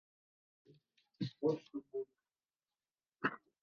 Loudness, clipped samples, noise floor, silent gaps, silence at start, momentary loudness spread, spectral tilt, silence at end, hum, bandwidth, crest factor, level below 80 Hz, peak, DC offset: -42 LUFS; under 0.1%; under -90 dBFS; none; 1.2 s; 9 LU; -5 dB/octave; 0.25 s; none; 6.8 kHz; 24 dB; -88 dBFS; -22 dBFS; under 0.1%